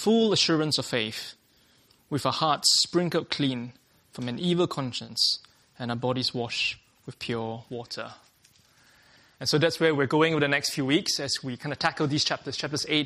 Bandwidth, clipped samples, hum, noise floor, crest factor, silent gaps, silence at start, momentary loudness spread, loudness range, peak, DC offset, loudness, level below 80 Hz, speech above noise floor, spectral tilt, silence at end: 15 kHz; under 0.1%; none; -62 dBFS; 20 dB; none; 0 s; 15 LU; 7 LU; -8 dBFS; under 0.1%; -26 LUFS; -66 dBFS; 36 dB; -3.5 dB/octave; 0 s